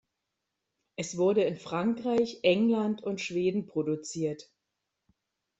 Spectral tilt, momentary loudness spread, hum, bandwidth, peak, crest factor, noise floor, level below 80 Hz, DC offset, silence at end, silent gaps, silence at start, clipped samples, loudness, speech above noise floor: -5.5 dB/octave; 10 LU; none; 8.2 kHz; -10 dBFS; 20 dB; -85 dBFS; -72 dBFS; under 0.1%; 1.15 s; none; 1 s; under 0.1%; -29 LUFS; 56 dB